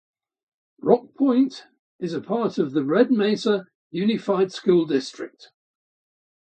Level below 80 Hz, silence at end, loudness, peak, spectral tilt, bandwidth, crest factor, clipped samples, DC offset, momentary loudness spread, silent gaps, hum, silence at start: -72 dBFS; 1.15 s; -22 LUFS; -2 dBFS; -6.5 dB/octave; 8.8 kHz; 22 dB; under 0.1%; under 0.1%; 14 LU; 1.79-1.99 s, 3.75-3.90 s; none; 0.85 s